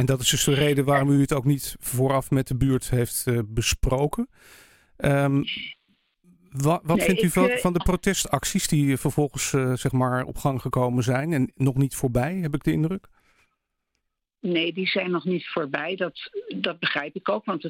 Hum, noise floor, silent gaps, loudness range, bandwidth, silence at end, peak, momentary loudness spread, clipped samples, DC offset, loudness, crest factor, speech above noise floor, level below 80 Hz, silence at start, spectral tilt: none; -78 dBFS; none; 5 LU; 17 kHz; 0 s; -6 dBFS; 8 LU; under 0.1%; under 0.1%; -24 LUFS; 18 dB; 55 dB; -40 dBFS; 0 s; -5 dB/octave